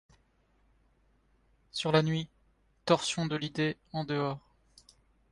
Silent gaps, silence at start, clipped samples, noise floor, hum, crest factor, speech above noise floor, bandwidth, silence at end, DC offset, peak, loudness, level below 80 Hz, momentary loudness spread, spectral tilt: none; 1.75 s; under 0.1%; -69 dBFS; none; 24 dB; 39 dB; 11.5 kHz; 0.95 s; under 0.1%; -10 dBFS; -31 LUFS; -66 dBFS; 13 LU; -5 dB/octave